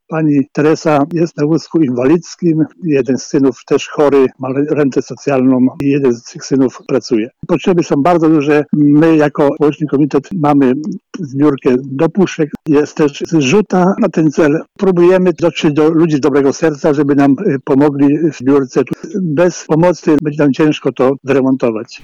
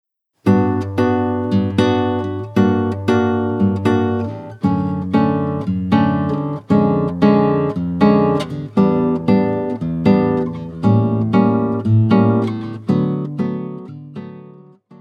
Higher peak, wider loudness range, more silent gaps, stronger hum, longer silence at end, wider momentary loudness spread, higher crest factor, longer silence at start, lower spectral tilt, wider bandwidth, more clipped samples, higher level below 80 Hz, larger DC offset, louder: about the same, -2 dBFS vs 0 dBFS; about the same, 2 LU vs 2 LU; neither; neither; about the same, 0.05 s vs 0.05 s; second, 5 LU vs 9 LU; second, 10 dB vs 16 dB; second, 0.1 s vs 0.45 s; second, -7 dB/octave vs -9 dB/octave; about the same, 7.6 kHz vs 8 kHz; neither; about the same, -50 dBFS vs -50 dBFS; neither; first, -12 LUFS vs -17 LUFS